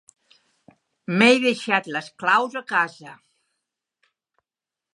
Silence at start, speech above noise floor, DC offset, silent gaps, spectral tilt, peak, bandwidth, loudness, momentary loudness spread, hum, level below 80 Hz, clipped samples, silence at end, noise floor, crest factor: 1.1 s; 68 dB; under 0.1%; none; -4.5 dB/octave; -2 dBFS; 11.5 kHz; -20 LUFS; 11 LU; none; -78 dBFS; under 0.1%; 1.8 s; -89 dBFS; 24 dB